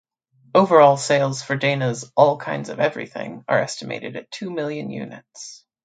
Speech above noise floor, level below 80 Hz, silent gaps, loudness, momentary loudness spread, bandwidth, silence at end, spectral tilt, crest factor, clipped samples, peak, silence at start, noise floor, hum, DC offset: 38 dB; -70 dBFS; none; -20 LUFS; 18 LU; 9.4 kHz; 0.3 s; -5 dB/octave; 20 dB; under 0.1%; 0 dBFS; 0.55 s; -58 dBFS; none; under 0.1%